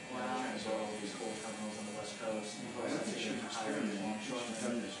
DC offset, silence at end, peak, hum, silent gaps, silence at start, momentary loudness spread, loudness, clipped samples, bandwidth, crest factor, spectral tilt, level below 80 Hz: under 0.1%; 0 s; -24 dBFS; none; none; 0 s; 5 LU; -39 LUFS; under 0.1%; 11.5 kHz; 14 dB; -3.5 dB/octave; -78 dBFS